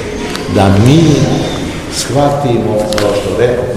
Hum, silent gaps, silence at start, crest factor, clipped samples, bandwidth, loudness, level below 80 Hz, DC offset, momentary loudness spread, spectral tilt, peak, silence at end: none; none; 0 s; 10 dB; 1%; 15.5 kHz; -11 LUFS; -30 dBFS; 0.6%; 10 LU; -6 dB/octave; 0 dBFS; 0 s